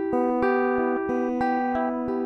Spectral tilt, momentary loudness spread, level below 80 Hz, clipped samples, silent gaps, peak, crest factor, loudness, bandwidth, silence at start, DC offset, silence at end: -7.5 dB/octave; 3 LU; -54 dBFS; under 0.1%; none; -12 dBFS; 12 dB; -24 LUFS; 6.4 kHz; 0 s; under 0.1%; 0 s